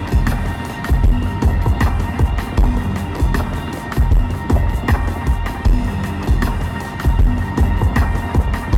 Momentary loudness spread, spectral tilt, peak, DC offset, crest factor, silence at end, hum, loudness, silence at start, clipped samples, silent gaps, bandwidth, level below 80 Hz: 5 LU; -7 dB/octave; -4 dBFS; under 0.1%; 12 dB; 0 s; none; -19 LUFS; 0 s; under 0.1%; none; 15.5 kHz; -18 dBFS